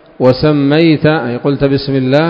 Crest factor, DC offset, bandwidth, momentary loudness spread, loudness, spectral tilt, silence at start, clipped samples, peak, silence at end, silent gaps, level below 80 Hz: 10 dB; under 0.1%; 6.4 kHz; 4 LU; -11 LUFS; -9 dB/octave; 0.2 s; 0.3%; 0 dBFS; 0 s; none; -40 dBFS